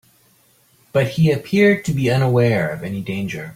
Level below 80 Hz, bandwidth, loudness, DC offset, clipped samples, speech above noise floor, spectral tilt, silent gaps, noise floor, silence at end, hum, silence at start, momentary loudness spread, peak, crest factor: -50 dBFS; 16 kHz; -18 LUFS; under 0.1%; under 0.1%; 39 dB; -7 dB/octave; none; -56 dBFS; 0 s; none; 0.95 s; 10 LU; -4 dBFS; 16 dB